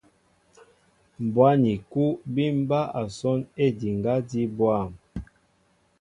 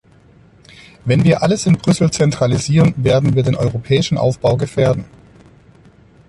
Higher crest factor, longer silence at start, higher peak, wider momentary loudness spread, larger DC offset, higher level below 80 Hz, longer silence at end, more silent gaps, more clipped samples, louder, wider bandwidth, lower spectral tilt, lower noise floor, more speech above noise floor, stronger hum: first, 20 dB vs 14 dB; first, 1.2 s vs 1.05 s; second, -6 dBFS vs -2 dBFS; first, 12 LU vs 4 LU; neither; second, -54 dBFS vs -42 dBFS; second, 0.75 s vs 1.25 s; neither; neither; second, -25 LUFS vs -15 LUFS; about the same, 11 kHz vs 11.5 kHz; first, -8 dB/octave vs -6.5 dB/octave; first, -66 dBFS vs -47 dBFS; first, 42 dB vs 33 dB; neither